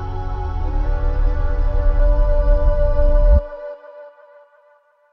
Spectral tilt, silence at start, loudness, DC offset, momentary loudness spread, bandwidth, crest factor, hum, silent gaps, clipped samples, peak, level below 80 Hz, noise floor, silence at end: -9.5 dB/octave; 0 s; -21 LUFS; under 0.1%; 15 LU; 3.1 kHz; 12 dB; none; none; under 0.1%; -4 dBFS; -16 dBFS; -55 dBFS; 1.05 s